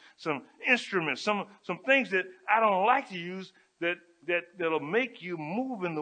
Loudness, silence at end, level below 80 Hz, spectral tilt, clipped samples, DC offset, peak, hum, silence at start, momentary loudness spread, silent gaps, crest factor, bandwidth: -29 LUFS; 0 s; -86 dBFS; -5 dB/octave; under 0.1%; under 0.1%; -10 dBFS; none; 0.2 s; 13 LU; none; 20 dB; 9.4 kHz